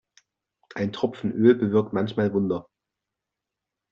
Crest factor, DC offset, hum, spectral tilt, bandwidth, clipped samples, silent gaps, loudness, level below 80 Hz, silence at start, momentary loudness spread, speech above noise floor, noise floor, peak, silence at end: 20 dB; under 0.1%; none; -7 dB/octave; 7 kHz; under 0.1%; none; -24 LUFS; -64 dBFS; 0.75 s; 11 LU; 63 dB; -86 dBFS; -6 dBFS; 1.3 s